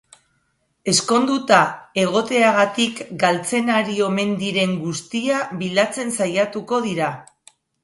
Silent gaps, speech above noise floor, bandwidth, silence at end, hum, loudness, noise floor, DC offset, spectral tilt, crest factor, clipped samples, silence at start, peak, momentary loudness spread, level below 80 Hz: none; 48 dB; 11.5 kHz; 0.6 s; none; -19 LUFS; -68 dBFS; under 0.1%; -4 dB/octave; 20 dB; under 0.1%; 0.85 s; 0 dBFS; 8 LU; -64 dBFS